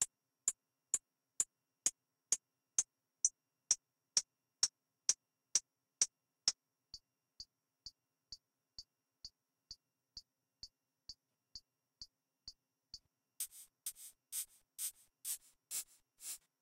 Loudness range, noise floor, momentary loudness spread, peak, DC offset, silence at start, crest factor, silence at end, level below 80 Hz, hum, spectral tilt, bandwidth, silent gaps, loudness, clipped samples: 20 LU; -61 dBFS; 20 LU; -18 dBFS; under 0.1%; 0 s; 28 dB; 0.25 s; -78 dBFS; none; 2.5 dB/octave; 16 kHz; none; -40 LUFS; under 0.1%